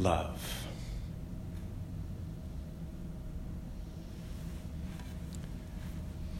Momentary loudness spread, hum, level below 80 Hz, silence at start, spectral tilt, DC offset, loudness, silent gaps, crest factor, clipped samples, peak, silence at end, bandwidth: 5 LU; none; -44 dBFS; 0 s; -6 dB/octave; under 0.1%; -42 LUFS; none; 24 dB; under 0.1%; -14 dBFS; 0 s; 16 kHz